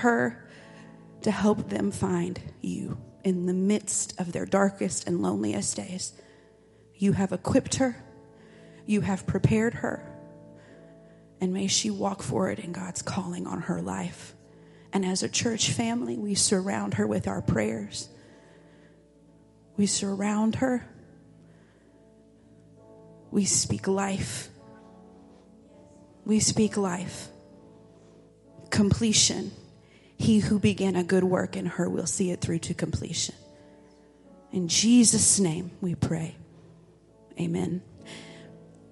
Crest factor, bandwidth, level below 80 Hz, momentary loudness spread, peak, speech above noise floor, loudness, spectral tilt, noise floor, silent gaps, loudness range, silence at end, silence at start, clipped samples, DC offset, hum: 22 dB; 11.5 kHz; -54 dBFS; 15 LU; -6 dBFS; 31 dB; -27 LUFS; -4 dB/octave; -57 dBFS; none; 7 LU; 0.25 s; 0 s; under 0.1%; under 0.1%; none